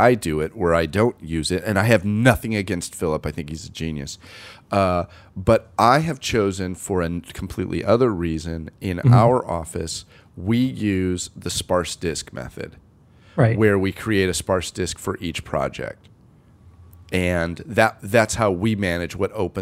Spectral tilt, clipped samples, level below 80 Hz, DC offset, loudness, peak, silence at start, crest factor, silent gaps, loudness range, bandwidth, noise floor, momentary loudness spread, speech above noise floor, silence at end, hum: -5.5 dB/octave; under 0.1%; -42 dBFS; under 0.1%; -21 LUFS; 0 dBFS; 0 s; 22 dB; none; 4 LU; 16 kHz; -51 dBFS; 14 LU; 30 dB; 0 s; none